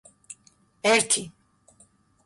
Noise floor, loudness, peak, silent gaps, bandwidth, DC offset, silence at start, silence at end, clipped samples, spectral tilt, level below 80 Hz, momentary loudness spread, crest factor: -61 dBFS; -22 LUFS; -8 dBFS; none; 11.5 kHz; under 0.1%; 0.3 s; 0.95 s; under 0.1%; -1 dB/octave; -68 dBFS; 25 LU; 20 dB